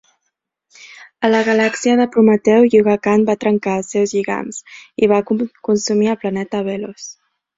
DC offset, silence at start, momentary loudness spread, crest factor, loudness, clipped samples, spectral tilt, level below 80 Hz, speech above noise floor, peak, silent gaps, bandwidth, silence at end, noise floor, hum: under 0.1%; 0.85 s; 14 LU; 14 dB; -16 LUFS; under 0.1%; -5.5 dB/octave; -58 dBFS; 59 dB; -2 dBFS; none; 7.8 kHz; 0.45 s; -74 dBFS; none